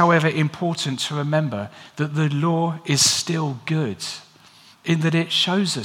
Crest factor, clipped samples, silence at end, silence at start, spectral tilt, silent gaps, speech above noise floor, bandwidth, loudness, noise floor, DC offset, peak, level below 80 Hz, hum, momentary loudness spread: 18 dB; under 0.1%; 0 s; 0 s; -4 dB/octave; none; 29 dB; 16 kHz; -21 LUFS; -50 dBFS; under 0.1%; -2 dBFS; -68 dBFS; none; 13 LU